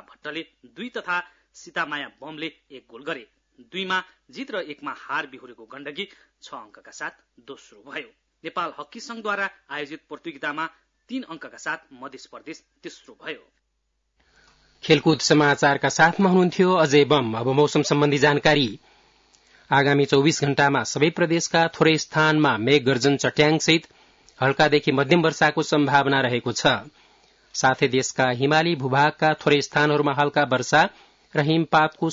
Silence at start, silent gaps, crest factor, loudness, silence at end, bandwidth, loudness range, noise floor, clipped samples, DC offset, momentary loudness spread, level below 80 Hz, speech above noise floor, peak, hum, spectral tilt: 0.25 s; none; 18 dB; -21 LUFS; 0 s; 7.8 kHz; 16 LU; -74 dBFS; under 0.1%; under 0.1%; 19 LU; -62 dBFS; 52 dB; -4 dBFS; none; -4.5 dB/octave